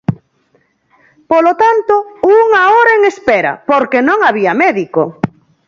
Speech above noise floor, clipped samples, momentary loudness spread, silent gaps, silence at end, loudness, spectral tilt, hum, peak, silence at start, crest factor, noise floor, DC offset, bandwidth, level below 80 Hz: 46 dB; under 0.1%; 10 LU; none; 0.4 s; -10 LUFS; -6.5 dB/octave; none; 0 dBFS; 0.1 s; 12 dB; -56 dBFS; under 0.1%; 7.6 kHz; -52 dBFS